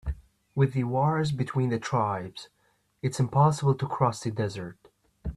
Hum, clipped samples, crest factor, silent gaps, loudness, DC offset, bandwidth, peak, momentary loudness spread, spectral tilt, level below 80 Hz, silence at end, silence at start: none; under 0.1%; 18 dB; none; -27 LUFS; under 0.1%; 12 kHz; -10 dBFS; 17 LU; -7 dB/octave; -46 dBFS; 0 s; 0.05 s